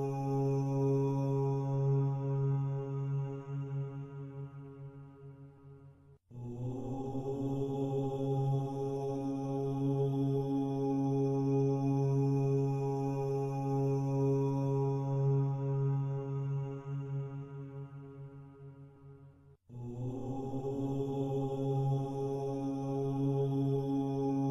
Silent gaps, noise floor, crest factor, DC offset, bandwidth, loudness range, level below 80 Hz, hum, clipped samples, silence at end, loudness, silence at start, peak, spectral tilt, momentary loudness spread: none; -59 dBFS; 12 dB; under 0.1%; 6.6 kHz; 12 LU; -62 dBFS; none; under 0.1%; 0 s; -34 LUFS; 0 s; -22 dBFS; -10 dB/octave; 17 LU